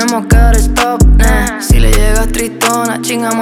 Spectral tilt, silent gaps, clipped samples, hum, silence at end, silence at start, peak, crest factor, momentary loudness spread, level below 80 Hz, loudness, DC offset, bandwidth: -4.5 dB/octave; none; under 0.1%; none; 0 s; 0 s; 0 dBFS; 8 dB; 5 LU; -10 dBFS; -11 LUFS; under 0.1%; 16.5 kHz